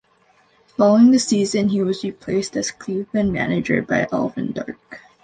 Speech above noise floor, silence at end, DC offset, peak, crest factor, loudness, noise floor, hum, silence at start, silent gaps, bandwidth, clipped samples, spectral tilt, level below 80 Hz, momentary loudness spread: 39 dB; 0.25 s; under 0.1%; -4 dBFS; 16 dB; -19 LUFS; -58 dBFS; none; 0.8 s; none; 9.6 kHz; under 0.1%; -5.5 dB/octave; -52 dBFS; 14 LU